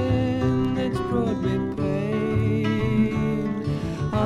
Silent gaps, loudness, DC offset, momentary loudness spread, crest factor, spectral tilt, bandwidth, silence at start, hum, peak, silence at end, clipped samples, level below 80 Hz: none; -24 LUFS; under 0.1%; 4 LU; 14 dB; -8 dB/octave; 12 kHz; 0 s; none; -8 dBFS; 0 s; under 0.1%; -40 dBFS